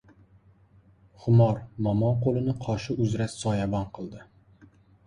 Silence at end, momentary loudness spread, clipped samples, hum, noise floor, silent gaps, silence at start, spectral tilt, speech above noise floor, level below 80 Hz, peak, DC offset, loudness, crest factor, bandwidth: 0.85 s; 14 LU; under 0.1%; none; -58 dBFS; none; 1.2 s; -7.5 dB/octave; 33 dB; -52 dBFS; -10 dBFS; under 0.1%; -26 LUFS; 16 dB; 10.5 kHz